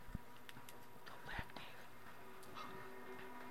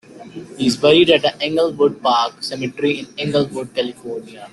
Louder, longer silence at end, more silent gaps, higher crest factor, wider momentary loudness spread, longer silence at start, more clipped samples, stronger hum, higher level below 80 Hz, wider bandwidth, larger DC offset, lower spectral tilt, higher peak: second, -54 LUFS vs -17 LUFS; about the same, 0 s vs 0.05 s; neither; first, 24 dB vs 16 dB; second, 8 LU vs 18 LU; about the same, 0 s vs 0.1 s; neither; neither; second, -64 dBFS vs -56 dBFS; first, 16.5 kHz vs 12 kHz; first, 0.2% vs under 0.1%; about the same, -4.5 dB/octave vs -5 dB/octave; second, -30 dBFS vs -2 dBFS